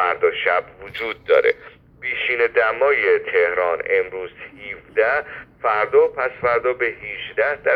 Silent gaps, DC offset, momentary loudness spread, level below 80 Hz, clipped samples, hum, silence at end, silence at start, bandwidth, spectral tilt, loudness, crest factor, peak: none; under 0.1%; 13 LU; -56 dBFS; under 0.1%; none; 0 s; 0 s; 5.2 kHz; -6 dB/octave; -19 LUFS; 18 dB; -2 dBFS